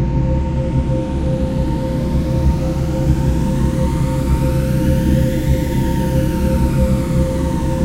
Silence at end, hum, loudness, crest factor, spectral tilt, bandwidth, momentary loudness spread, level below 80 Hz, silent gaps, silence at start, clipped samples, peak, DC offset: 0 s; none; -17 LUFS; 14 dB; -8 dB/octave; 16 kHz; 3 LU; -20 dBFS; none; 0 s; under 0.1%; -2 dBFS; under 0.1%